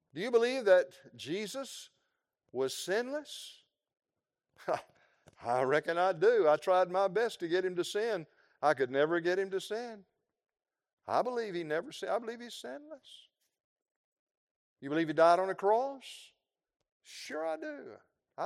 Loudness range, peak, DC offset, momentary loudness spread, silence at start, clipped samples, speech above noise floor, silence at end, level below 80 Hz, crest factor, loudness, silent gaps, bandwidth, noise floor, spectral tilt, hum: 9 LU; -12 dBFS; under 0.1%; 20 LU; 0.15 s; under 0.1%; over 58 dB; 0 s; -88 dBFS; 20 dB; -32 LUFS; 10.93-10.97 s, 13.64-13.76 s, 13.96-14.27 s, 14.37-14.76 s, 16.92-17.00 s; 16 kHz; under -90 dBFS; -4.5 dB/octave; none